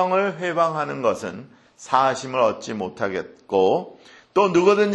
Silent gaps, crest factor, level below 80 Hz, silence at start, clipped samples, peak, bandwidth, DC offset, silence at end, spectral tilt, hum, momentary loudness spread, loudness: none; 18 dB; -64 dBFS; 0 s; under 0.1%; -2 dBFS; 10.5 kHz; under 0.1%; 0 s; -5.5 dB/octave; none; 13 LU; -22 LUFS